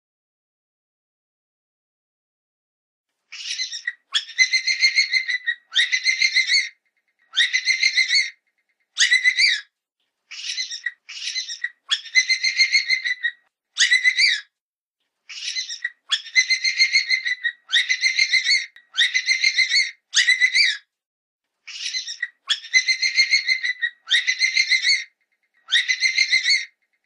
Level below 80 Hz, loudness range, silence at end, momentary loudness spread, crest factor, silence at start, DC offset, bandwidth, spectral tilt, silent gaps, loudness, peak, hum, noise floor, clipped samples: under -90 dBFS; 3 LU; 0.4 s; 13 LU; 18 dB; 3.3 s; under 0.1%; 10.5 kHz; 8.5 dB/octave; 14.61-14.94 s, 21.06-21.39 s; -18 LUFS; -4 dBFS; none; -89 dBFS; under 0.1%